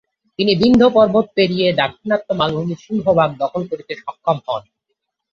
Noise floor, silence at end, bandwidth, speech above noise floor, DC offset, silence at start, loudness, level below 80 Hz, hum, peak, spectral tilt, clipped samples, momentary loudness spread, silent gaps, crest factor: -75 dBFS; 0.7 s; 7.4 kHz; 59 dB; under 0.1%; 0.4 s; -17 LUFS; -50 dBFS; none; -2 dBFS; -7 dB/octave; under 0.1%; 14 LU; none; 16 dB